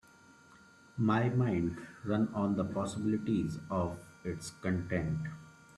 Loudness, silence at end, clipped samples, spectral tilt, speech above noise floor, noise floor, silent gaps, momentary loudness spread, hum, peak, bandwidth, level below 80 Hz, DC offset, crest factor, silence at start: -34 LUFS; 0.05 s; under 0.1%; -7.5 dB/octave; 27 dB; -60 dBFS; none; 12 LU; none; -16 dBFS; 12.5 kHz; -62 dBFS; under 0.1%; 18 dB; 0.5 s